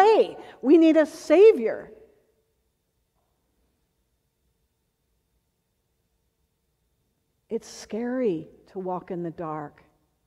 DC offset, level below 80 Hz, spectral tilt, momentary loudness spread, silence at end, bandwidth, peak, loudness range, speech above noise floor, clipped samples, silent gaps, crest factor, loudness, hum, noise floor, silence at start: under 0.1%; -70 dBFS; -6 dB/octave; 19 LU; 0.6 s; 11.5 kHz; -6 dBFS; 20 LU; 53 dB; under 0.1%; none; 18 dB; -21 LUFS; none; -74 dBFS; 0 s